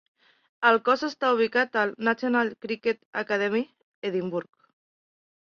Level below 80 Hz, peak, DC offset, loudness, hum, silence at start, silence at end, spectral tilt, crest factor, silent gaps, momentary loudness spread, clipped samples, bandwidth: -74 dBFS; -6 dBFS; under 0.1%; -26 LUFS; none; 0.6 s; 1.15 s; -5.5 dB/octave; 22 dB; 3.05-3.13 s, 3.83-4.02 s; 9 LU; under 0.1%; 7 kHz